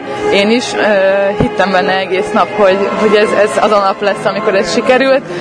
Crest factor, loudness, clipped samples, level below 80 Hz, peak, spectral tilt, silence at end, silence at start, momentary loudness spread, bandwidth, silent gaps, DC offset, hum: 10 dB; -11 LUFS; 0.2%; -42 dBFS; 0 dBFS; -4.5 dB/octave; 0 s; 0 s; 4 LU; 10.5 kHz; none; under 0.1%; none